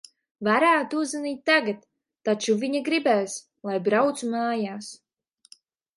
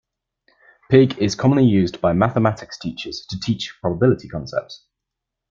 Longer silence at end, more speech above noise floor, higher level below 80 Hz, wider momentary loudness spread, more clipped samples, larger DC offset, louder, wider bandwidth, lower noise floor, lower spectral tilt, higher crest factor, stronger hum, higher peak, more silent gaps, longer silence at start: first, 1 s vs 0.75 s; second, 33 dB vs 64 dB; second, -76 dBFS vs -50 dBFS; about the same, 12 LU vs 14 LU; neither; neither; second, -24 LUFS vs -19 LUFS; first, 11.5 kHz vs 7.6 kHz; second, -57 dBFS vs -82 dBFS; second, -4 dB/octave vs -7 dB/octave; about the same, 18 dB vs 18 dB; neither; second, -6 dBFS vs -2 dBFS; neither; second, 0.4 s vs 0.9 s